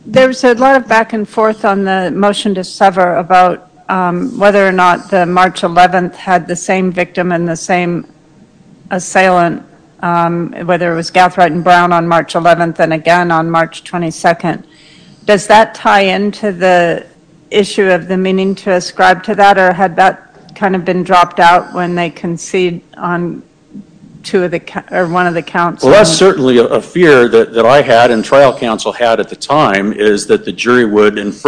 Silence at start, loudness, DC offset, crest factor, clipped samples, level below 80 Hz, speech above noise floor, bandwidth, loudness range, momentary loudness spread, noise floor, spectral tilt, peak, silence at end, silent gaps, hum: 0.05 s; -10 LUFS; under 0.1%; 10 dB; 3%; -46 dBFS; 33 dB; 11 kHz; 6 LU; 10 LU; -43 dBFS; -5 dB/octave; 0 dBFS; 0 s; none; none